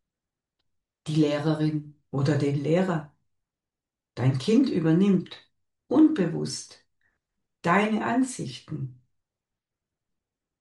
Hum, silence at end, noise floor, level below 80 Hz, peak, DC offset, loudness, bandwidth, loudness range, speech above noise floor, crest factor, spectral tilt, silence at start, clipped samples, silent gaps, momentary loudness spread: none; 1.7 s; -90 dBFS; -68 dBFS; -8 dBFS; under 0.1%; -25 LUFS; 11.5 kHz; 5 LU; 66 dB; 18 dB; -6.5 dB/octave; 1.05 s; under 0.1%; none; 15 LU